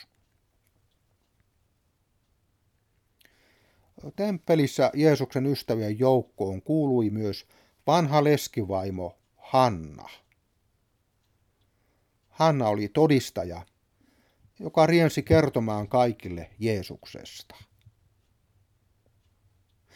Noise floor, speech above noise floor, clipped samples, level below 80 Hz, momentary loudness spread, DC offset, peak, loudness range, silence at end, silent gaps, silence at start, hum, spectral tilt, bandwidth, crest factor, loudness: -71 dBFS; 47 dB; under 0.1%; -56 dBFS; 19 LU; under 0.1%; -6 dBFS; 7 LU; 2.55 s; none; 4.05 s; none; -6.5 dB/octave; 17 kHz; 22 dB; -25 LUFS